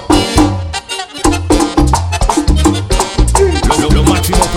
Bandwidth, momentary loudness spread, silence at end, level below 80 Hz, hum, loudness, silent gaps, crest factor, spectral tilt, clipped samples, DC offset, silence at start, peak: 17 kHz; 5 LU; 0 s; -16 dBFS; none; -12 LUFS; none; 10 dB; -5 dB/octave; 0.7%; under 0.1%; 0 s; 0 dBFS